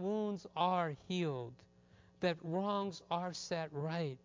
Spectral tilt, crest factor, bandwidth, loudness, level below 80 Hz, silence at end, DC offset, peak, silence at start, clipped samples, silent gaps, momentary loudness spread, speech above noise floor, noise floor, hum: -6 dB/octave; 20 dB; 7.6 kHz; -38 LUFS; -74 dBFS; 0.1 s; under 0.1%; -20 dBFS; 0 s; under 0.1%; none; 6 LU; 27 dB; -65 dBFS; none